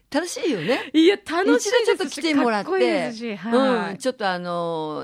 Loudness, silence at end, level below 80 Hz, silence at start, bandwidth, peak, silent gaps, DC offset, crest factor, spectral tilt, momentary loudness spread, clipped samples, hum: -21 LUFS; 0 s; -68 dBFS; 0.1 s; 15 kHz; -6 dBFS; none; under 0.1%; 16 dB; -4 dB/octave; 8 LU; under 0.1%; none